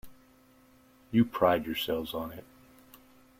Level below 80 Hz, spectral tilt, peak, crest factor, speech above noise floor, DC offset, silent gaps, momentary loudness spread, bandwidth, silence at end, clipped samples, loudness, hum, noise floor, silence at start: -60 dBFS; -6.5 dB/octave; -10 dBFS; 22 dB; 32 dB; under 0.1%; none; 15 LU; 16.5 kHz; 1 s; under 0.1%; -30 LUFS; none; -61 dBFS; 0.05 s